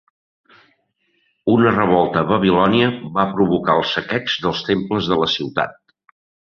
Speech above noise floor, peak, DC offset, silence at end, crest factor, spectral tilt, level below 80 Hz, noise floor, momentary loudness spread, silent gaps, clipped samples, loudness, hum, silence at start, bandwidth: 49 dB; -2 dBFS; under 0.1%; 0.75 s; 16 dB; -6.5 dB/octave; -50 dBFS; -66 dBFS; 6 LU; none; under 0.1%; -18 LUFS; none; 1.45 s; 6.8 kHz